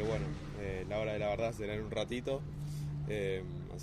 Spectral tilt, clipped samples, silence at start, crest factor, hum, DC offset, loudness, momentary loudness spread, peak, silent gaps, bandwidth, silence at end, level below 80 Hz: -6.5 dB/octave; under 0.1%; 0 s; 16 dB; none; under 0.1%; -38 LUFS; 6 LU; -22 dBFS; none; 14 kHz; 0 s; -50 dBFS